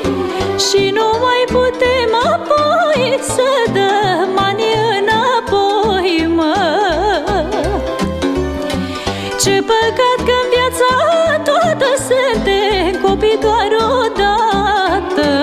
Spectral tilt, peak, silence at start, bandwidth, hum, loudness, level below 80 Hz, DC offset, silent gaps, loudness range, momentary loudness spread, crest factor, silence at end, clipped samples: -4 dB/octave; -2 dBFS; 0 s; 15 kHz; none; -14 LUFS; -32 dBFS; under 0.1%; none; 3 LU; 5 LU; 12 dB; 0 s; under 0.1%